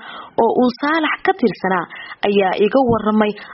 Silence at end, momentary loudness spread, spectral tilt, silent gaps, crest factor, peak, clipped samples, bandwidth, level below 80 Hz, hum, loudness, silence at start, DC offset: 0 s; 6 LU; -4 dB/octave; none; 16 dB; -2 dBFS; under 0.1%; 5.8 kHz; -50 dBFS; none; -17 LUFS; 0 s; under 0.1%